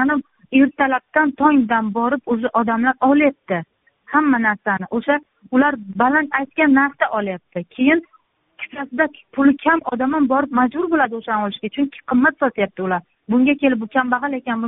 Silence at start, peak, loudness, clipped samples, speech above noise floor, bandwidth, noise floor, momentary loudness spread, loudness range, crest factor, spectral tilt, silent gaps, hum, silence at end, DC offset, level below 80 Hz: 0 s; 0 dBFS; -18 LUFS; under 0.1%; 34 dB; 3.9 kHz; -52 dBFS; 8 LU; 2 LU; 18 dB; -4 dB/octave; none; none; 0 s; under 0.1%; -58 dBFS